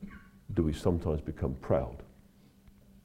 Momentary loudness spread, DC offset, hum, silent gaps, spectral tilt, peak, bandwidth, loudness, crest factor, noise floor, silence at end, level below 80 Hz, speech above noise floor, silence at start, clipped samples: 19 LU; under 0.1%; none; none; -8.5 dB/octave; -14 dBFS; 15 kHz; -33 LUFS; 20 dB; -60 dBFS; 0.95 s; -46 dBFS; 29 dB; 0 s; under 0.1%